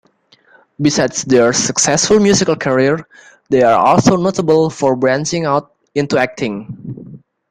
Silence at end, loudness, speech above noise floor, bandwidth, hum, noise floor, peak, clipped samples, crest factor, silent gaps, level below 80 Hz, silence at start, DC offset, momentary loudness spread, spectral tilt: 0.35 s; -14 LUFS; 39 dB; 11 kHz; none; -52 dBFS; 0 dBFS; under 0.1%; 14 dB; none; -48 dBFS; 0.8 s; under 0.1%; 12 LU; -4 dB/octave